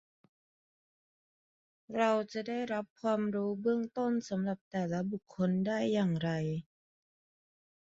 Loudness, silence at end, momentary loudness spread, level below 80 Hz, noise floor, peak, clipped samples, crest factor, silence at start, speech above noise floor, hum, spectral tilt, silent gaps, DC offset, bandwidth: -34 LUFS; 1.3 s; 7 LU; -74 dBFS; under -90 dBFS; -16 dBFS; under 0.1%; 18 dB; 1.9 s; over 57 dB; none; -6.5 dB/octave; 2.90-2.96 s, 4.61-4.71 s; under 0.1%; 7.6 kHz